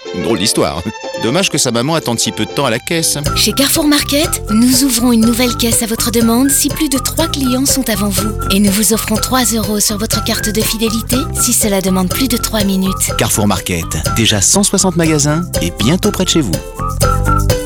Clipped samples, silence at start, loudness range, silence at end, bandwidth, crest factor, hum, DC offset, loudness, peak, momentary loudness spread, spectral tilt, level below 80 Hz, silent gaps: under 0.1%; 0 s; 2 LU; 0 s; over 20 kHz; 12 dB; none; under 0.1%; -12 LUFS; 0 dBFS; 6 LU; -3.5 dB/octave; -26 dBFS; none